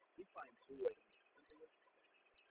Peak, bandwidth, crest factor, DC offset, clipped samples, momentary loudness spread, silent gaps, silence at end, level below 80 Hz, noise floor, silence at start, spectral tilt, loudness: -30 dBFS; 4 kHz; 24 dB; under 0.1%; under 0.1%; 20 LU; none; 0.85 s; -88 dBFS; -75 dBFS; 0.2 s; -3.5 dB/octave; -50 LUFS